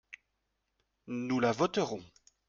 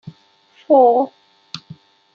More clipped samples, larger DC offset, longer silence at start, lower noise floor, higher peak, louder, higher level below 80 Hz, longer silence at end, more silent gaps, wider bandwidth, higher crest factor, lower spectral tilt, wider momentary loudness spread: neither; neither; first, 1.05 s vs 0.05 s; first, -82 dBFS vs -53 dBFS; second, -16 dBFS vs -2 dBFS; second, -32 LUFS vs -15 LUFS; about the same, -70 dBFS vs -72 dBFS; second, 0.45 s vs 0.6 s; neither; about the same, 7.6 kHz vs 7 kHz; about the same, 20 dB vs 16 dB; second, -5.5 dB/octave vs -7 dB/octave; about the same, 21 LU vs 22 LU